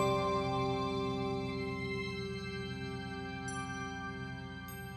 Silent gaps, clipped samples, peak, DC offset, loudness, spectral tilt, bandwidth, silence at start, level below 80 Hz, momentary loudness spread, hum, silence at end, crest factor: none; under 0.1%; -20 dBFS; under 0.1%; -38 LUFS; -5.5 dB/octave; 13.5 kHz; 0 s; -56 dBFS; 9 LU; 60 Hz at -50 dBFS; 0 s; 18 dB